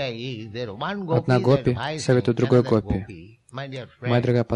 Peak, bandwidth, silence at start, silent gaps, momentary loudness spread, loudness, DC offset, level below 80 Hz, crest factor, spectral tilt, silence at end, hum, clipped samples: -6 dBFS; 10.5 kHz; 0 s; none; 15 LU; -23 LUFS; under 0.1%; -46 dBFS; 18 dB; -7 dB/octave; 0 s; none; under 0.1%